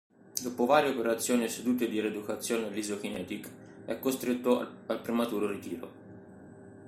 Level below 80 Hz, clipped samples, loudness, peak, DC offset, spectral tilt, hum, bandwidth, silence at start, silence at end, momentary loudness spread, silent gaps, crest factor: -74 dBFS; under 0.1%; -31 LUFS; -10 dBFS; under 0.1%; -4 dB/octave; none; 16 kHz; 0.35 s; 0 s; 21 LU; none; 22 dB